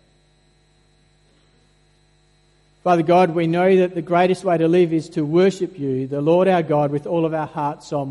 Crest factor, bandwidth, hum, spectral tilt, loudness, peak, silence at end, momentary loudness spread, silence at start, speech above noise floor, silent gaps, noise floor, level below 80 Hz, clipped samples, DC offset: 16 dB; 11 kHz; 50 Hz at -50 dBFS; -7.5 dB/octave; -19 LUFS; -4 dBFS; 0 s; 9 LU; 2.85 s; 40 dB; none; -58 dBFS; -62 dBFS; under 0.1%; under 0.1%